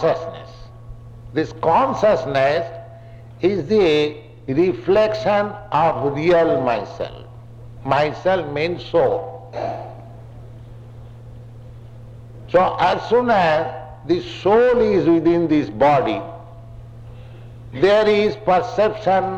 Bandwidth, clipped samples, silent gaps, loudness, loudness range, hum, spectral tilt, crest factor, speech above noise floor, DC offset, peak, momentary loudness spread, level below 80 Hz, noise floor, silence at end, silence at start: 8.4 kHz; under 0.1%; none; -18 LUFS; 7 LU; none; -7 dB/octave; 12 dB; 22 dB; under 0.1%; -6 dBFS; 24 LU; -46 dBFS; -39 dBFS; 0 s; 0 s